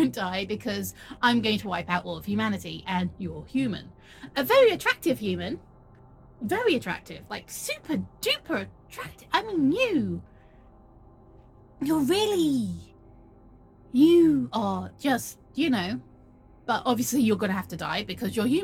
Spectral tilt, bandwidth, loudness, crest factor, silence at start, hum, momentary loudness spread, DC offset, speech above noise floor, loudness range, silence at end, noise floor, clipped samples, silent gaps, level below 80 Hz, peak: -5 dB/octave; 17.5 kHz; -26 LUFS; 20 dB; 0 s; none; 15 LU; under 0.1%; 27 dB; 5 LU; 0 s; -53 dBFS; under 0.1%; none; -56 dBFS; -8 dBFS